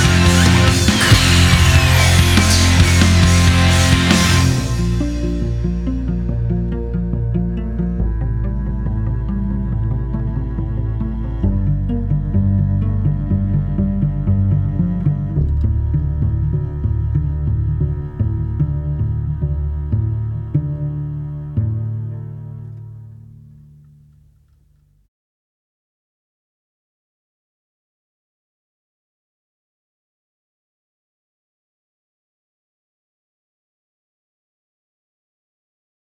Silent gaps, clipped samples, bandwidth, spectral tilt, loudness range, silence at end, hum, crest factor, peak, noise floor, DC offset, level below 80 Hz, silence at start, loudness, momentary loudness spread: none; under 0.1%; 16.5 kHz; -5 dB/octave; 12 LU; 12.9 s; none; 16 dB; -2 dBFS; -55 dBFS; under 0.1%; -24 dBFS; 0 s; -17 LUFS; 11 LU